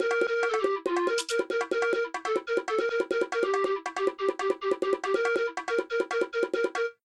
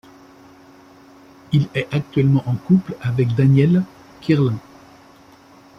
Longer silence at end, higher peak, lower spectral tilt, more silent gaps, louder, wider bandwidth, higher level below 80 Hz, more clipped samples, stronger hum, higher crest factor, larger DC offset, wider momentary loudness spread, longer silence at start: second, 0.1 s vs 1.2 s; second, -14 dBFS vs -4 dBFS; second, -2.5 dB/octave vs -9 dB/octave; neither; second, -28 LUFS vs -18 LUFS; first, 12.5 kHz vs 6.4 kHz; second, -74 dBFS vs -52 dBFS; neither; neither; about the same, 14 dB vs 16 dB; neither; second, 3 LU vs 9 LU; second, 0 s vs 1.5 s